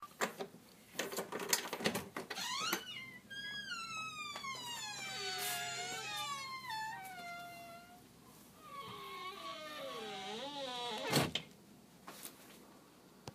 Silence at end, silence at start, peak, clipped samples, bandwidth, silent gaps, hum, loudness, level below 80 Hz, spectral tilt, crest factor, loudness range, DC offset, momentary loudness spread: 0 s; 0 s; -14 dBFS; under 0.1%; 15.5 kHz; none; none; -41 LUFS; -74 dBFS; -2 dB/octave; 28 dB; 8 LU; under 0.1%; 21 LU